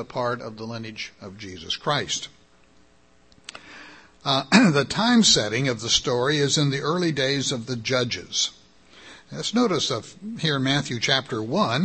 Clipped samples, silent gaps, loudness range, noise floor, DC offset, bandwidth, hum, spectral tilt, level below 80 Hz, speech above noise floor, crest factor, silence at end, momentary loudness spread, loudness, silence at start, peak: under 0.1%; none; 11 LU; -58 dBFS; 0.1%; 8.8 kHz; none; -3.5 dB/octave; -56 dBFS; 35 dB; 24 dB; 0 s; 21 LU; -22 LUFS; 0 s; -2 dBFS